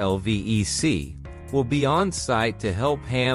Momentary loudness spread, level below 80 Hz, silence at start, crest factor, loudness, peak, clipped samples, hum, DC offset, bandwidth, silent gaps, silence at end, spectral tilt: 6 LU; -42 dBFS; 0 s; 14 dB; -24 LUFS; -10 dBFS; under 0.1%; none; under 0.1%; 13 kHz; none; 0 s; -5 dB/octave